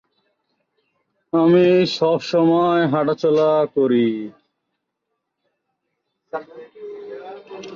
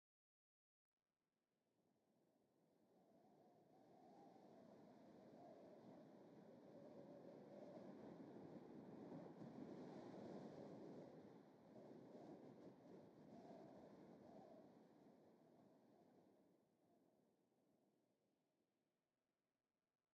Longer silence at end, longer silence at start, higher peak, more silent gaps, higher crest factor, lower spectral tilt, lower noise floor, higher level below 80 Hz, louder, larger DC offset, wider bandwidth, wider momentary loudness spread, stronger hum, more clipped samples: second, 0 s vs 1.85 s; second, 1.35 s vs 1.8 s; first, -6 dBFS vs -46 dBFS; neither; about the same, 16 dB vs 18 dB; about the same, -7 dB/octave vs -7 dB/octave; second, -77 dBFS vs under -90 dBFS; first, -66 dBFS vs under -90 dBFS; first, -17 LUFS vs -63 LUFS; neither; about the same, 7.2 kHz vs 7.2 kHz; first, 21 LU vs 9 LU; neither; neither